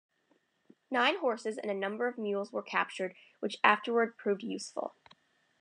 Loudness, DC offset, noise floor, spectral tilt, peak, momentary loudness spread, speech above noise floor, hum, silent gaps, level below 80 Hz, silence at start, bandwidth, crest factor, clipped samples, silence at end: -32 LUFS; under 0.1%; -74 dBFS; -4 dB/octave; -10 dBFS; 12 LU; 41 dB; none; none; under -90 dBFS; 0.9 s; 10 kHz; 24 dB; under 0.1%; 0.7 s